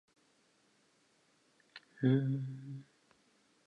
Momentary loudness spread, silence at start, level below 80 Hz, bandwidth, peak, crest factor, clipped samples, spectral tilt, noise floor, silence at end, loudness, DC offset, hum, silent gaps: 25 LU; 1.75 s; -84 dBFS; 7.6 kHz; -18 dBFS; 22 dB; under 0.1%; -9 dB/octave; -72 dBFS; 0.85 s; -34 LUFS; under 0.1%; none; none